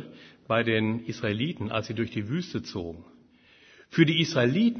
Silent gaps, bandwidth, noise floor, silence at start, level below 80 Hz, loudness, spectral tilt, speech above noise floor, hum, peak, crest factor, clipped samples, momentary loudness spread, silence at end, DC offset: none; 6.6 kHz; -58 dBFS; 0 s; -62 dBFS; -27 LUFS; -6 dB/octave; 31 dB; none; -6 dBFS; 22 dB; under 0.1%; 14 LU; 0 s; under 0.1%